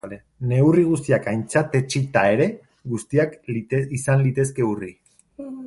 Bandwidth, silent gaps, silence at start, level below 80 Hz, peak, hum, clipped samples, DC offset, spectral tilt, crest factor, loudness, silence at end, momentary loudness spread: 11.5 kHz; none; 0.05 s; -56 dBFS; -2 dBFS; none; under 0.1%; under 0.1%; -6.5 dB/octave; 18 dB; -21 LUFS; 0 s; 13 LU